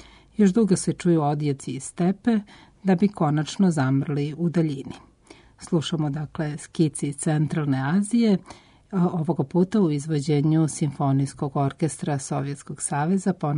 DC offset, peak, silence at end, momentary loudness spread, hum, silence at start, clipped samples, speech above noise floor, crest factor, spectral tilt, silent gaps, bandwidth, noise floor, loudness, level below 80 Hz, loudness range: under 0.1%; -8 dBFS; 0 s; 9 LU; none; 0.4 s; under 0.1%; 29 dB; 14 dB; -6.5 dB/octave; none; 11 kHz; -52 dBFS; -24 LUFS; -58 dBFS; 3 LU